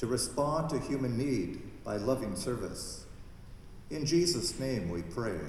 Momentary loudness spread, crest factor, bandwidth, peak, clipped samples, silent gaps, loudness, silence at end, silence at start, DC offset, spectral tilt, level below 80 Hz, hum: 22 LU; 18 dB; 15.5 kHz; -16 dBFS; under 0.1%; none; -33 LUFS; 0 s; 0 s; under 0.1%; -5 dB/octave; -50 dBFS; none